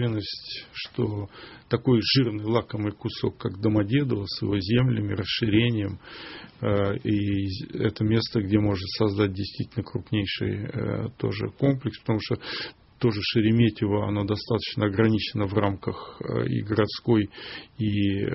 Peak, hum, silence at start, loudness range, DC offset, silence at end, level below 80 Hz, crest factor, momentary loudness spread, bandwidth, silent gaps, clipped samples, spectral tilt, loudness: -6 dBFS; none; 0 s; 3 LU; under 0.1%; 0 s; -52 dBFS; 18 dB; 11 LU; 6 kHz; none; under 0.1%; -5.5 dB/octave; -26 LUFS